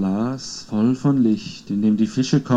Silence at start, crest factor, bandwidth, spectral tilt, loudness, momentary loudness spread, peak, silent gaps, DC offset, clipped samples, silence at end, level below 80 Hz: 0 s; 16 dB; 8.6 kHz; -6.5 dB/octave; -21 LUFS; 8 LU; -4 dBFS; none; under 0.1%; under 0.1%; 0 s; -56 dBFS